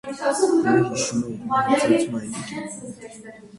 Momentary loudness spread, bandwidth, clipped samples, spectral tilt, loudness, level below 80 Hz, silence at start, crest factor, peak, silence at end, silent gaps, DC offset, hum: 19 LU; 11.5 kHz; under 0.1%; -4.5 dB/octave; -22 LUFS; -60 dBFS; 0.05 s; 16 dB; -6 dBFS; 0 s; none; under 0.1%; none